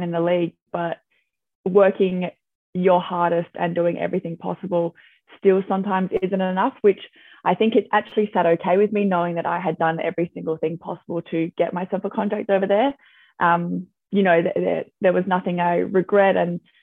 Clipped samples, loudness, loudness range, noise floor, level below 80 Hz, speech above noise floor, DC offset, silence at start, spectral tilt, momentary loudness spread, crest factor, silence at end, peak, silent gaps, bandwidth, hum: under 0.1%; -21 LUFS; 3 LU; -70 dBFS; -68 dBFS; 50 dB; under 0.1%; 0 s; -9.5 dB/octave; 10 LU; 18 dB; 0.25 s; -4 dBFS; 0.62-0.66 s, 1.55-1.64 s, 2.55-2.73 s; 4 kHz; none